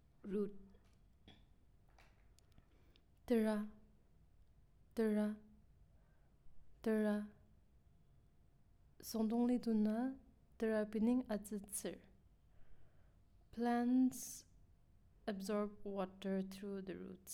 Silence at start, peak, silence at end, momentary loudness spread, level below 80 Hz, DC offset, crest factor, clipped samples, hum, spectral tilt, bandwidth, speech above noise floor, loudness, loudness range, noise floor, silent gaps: 0.25 s; -26 dBFS; 0 s; 14 LU; -68 dBFS; under 0.1%; 18 dB; under 0.1%; none; -6 dB/octave; 17 kHz; 29 dB; -41 LUFS; 6 LU; -69 dBFS; none